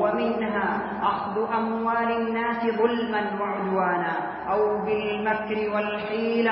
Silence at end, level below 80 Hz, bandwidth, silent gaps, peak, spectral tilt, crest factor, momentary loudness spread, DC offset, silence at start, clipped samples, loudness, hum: 0 s; -58 dBFS; 5.6 kHz; none; -10 dBFS; -10 dB/octave; 16 dB; 4 LU; under 0.1%; 0 s; under 0.1%; -25 LUFS; none